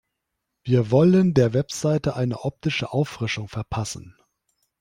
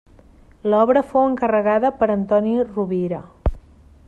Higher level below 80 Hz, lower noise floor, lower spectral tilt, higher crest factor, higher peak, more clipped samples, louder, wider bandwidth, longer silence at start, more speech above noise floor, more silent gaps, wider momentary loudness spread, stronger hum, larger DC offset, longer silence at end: second, -52 dBFS vs -36 dBFS; first, -80 dBFS vs -48 dBFS; second, -6.5 dB/octave vs -9 dB/octave; about the same, 16 dB vs 16 dB; about the same, -6 dBFS vs -4 dBFS; neither; second, -22 LUFS vs -19 LUFS; first, 12 kHz vs 9.2 kHz; about the same, 0.65 s vs 0.65 s; first, 58 dB vs 30 dB; neither; about the same, 13 LU vs 11 LU; neither; neither; first, 0.7 s vs 0.5 s